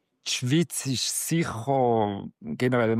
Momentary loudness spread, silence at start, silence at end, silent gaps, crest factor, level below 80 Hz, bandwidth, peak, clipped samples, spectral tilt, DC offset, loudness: 6 LU; 0.25 s; 0 s; none; 14 dB; -66 dBFS; 15.5 kHz; -12 dBFS; under 0.1%; -4.5 dB/octave; under 0.1%; -26 LUFS